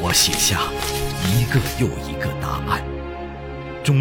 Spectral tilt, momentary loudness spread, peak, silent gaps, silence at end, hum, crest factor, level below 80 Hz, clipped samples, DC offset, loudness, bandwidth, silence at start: -3.5 dB/octave; 16 LU; -4 dBFS; none; 0 s; none; 18 dB; -34 dBFS; under 0.1%; under 0.1%; -21 LUFS; 17 kHz; 0 s